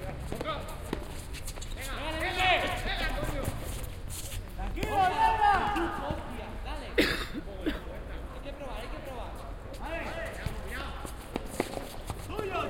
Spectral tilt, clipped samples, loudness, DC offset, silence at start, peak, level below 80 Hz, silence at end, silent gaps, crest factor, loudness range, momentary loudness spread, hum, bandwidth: -4.5 dB/octave; under 0.1%; -33 LUFS; under 0.1%; 0 s; -10 dBFS; -40 dBFS; 0 s; none; 22 dB; 10 LU; 15 LU; none; 16.5 kHz